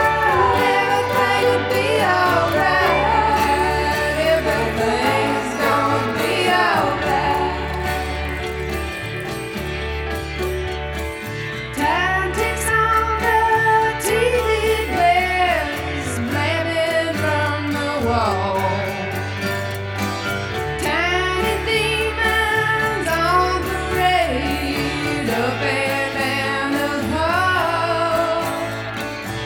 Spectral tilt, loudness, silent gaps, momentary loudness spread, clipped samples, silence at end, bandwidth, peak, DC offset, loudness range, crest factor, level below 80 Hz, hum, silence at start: -4.5 dB/octave; -19 LUFS; none; 9 LU; under 0.1%; 0 s; over 20 kHz; -2 dBFS; under 0.1%; 6 LU; 16 dB; -36 dBFS; none; 0 s